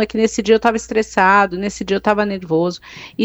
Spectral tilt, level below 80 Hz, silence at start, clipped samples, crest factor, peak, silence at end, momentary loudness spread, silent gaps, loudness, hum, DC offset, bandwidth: -5 dB/octave; -46 dBFS; 0 s; under 0.1%; 16 dB; 0 dBFS; 0 s; 10 LU; none; -16 LUFS; none; under 0.1%; 8.4 kHz